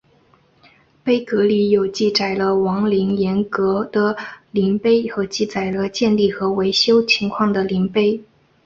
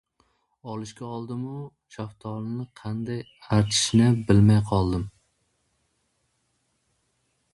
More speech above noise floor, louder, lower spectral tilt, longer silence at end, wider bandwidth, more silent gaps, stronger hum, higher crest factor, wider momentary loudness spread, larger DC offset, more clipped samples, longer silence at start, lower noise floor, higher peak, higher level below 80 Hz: second, 38 dB vs 48 dB; first, -18 LUFS vs -24 LUFS; about the same, -5.5 dB/octave vs -5.5 dB/octave; second, 0.4 s vs 2.45 s; second, 7.6 kHz vs 11.5 kHz; neither; neither; second, 16 dB vs 22 dB; second, 6 LU vs 19 LU; neither; neither; first, 1.05 s vs 0.65 s; second, -55 dBFS vs -72 dBFS; about the same, -4 dBFS vs -4 dBFS; second, -54 dBFS vs -46 dBFS